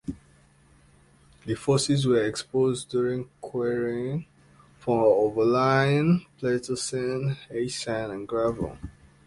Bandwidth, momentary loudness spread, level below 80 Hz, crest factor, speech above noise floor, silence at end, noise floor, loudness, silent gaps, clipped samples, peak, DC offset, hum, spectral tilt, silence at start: 11.5 kHz; 13 LU; -54 dBFS; 20 dB; 33 dB; 0.35 s; -58 dBFS; -26 LUFS; none; under 0.1%; -6 dBFS; under 0.1%; none; -5.5 dB/octave; 0.05 s